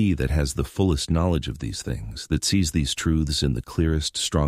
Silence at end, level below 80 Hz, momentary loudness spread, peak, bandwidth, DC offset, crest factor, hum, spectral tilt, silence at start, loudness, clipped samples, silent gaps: 0 s; -32 dBFS; 8 LU; -8 dBFS; 15.5 kHz; under 0.1%; 16 dB; none; -5 dB/octave; 0 s; -24 LUFS; under 0.1%; none